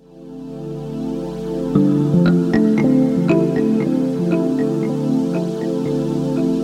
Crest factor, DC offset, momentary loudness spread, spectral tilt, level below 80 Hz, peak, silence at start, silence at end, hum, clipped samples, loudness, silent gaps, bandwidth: 16 dB; under 0.1%; 12 LU; -8.5 dB/octave; -48 dBFS; -2 dBFS; 0.15 s; 0 s; none; under 0.1%; -18 LUFS; none; 11.5 kHz